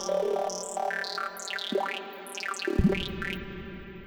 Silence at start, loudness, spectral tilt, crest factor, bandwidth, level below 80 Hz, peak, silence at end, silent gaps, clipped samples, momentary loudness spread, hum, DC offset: 0 s; -31 LUFS; -4.5 dB/octave; 22 dB; over 20 kHz; -42 dBFS; -8 dBFS; 0 s; none; under 0.1%; 11 LU; none; under 0.1%